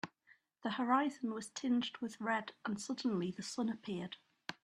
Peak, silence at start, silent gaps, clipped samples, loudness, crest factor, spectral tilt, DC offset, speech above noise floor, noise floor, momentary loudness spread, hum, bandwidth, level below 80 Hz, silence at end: -20 dBFS; 0.05 s; none; under 0.1%; -39 LUFS; 20 dB; -4.5 dB/octave; under 0.1%; 32 dB; -70 dBFS; 11 LU; none; 11.5 kHz; -82 dBFS; 0.1 s